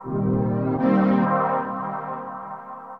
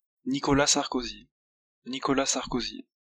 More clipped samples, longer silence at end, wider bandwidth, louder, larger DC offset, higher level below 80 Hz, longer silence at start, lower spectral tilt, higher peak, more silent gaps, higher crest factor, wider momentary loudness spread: neither; second, 0 s vs 0.25 s; second, 4.7 kHz vs 12 kHz; first, -23 LUFS vs -27 LUFS; neither; about the same, -52 dBFS vs -50 dBFS; second, 0 s vs 0.25 s; first, -11 dB/octave vs -3 dB/octave; about the same, -8 dBFS vs -8 dBFS; second, none vs 1.31-1.82 s; second, 14 dB vs 22 dB; about the same, 15 LU vs 15 LU